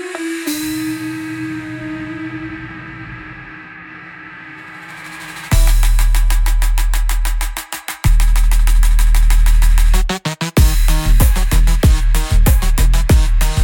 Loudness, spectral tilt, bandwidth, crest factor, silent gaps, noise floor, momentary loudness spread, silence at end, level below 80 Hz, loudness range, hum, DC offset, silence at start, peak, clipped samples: -16 LUFS; -4.5 dB/octave; 17.5 kHz; 12 dB; none; -34 dBFS; 17 LU; 0 s; -14 dBFS; 13 LU; none; under 0.1%; 0 s; 0 dBFS; under 0.1%